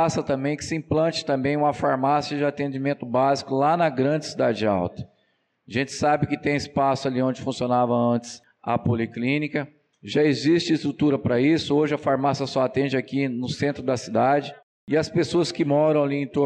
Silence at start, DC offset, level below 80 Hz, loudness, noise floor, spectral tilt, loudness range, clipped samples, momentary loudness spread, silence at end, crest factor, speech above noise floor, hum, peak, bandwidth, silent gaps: 0 s; under 0.1%; -58 dBFS; -23 LUFS; -69 dBFS; -6 dB/octave; 2 LU; under 0.1%; 7 LU; 0 s; 12 dB; 46 dB; none; -10 dBFS; 9.8 kHz; 14.63-14.87 s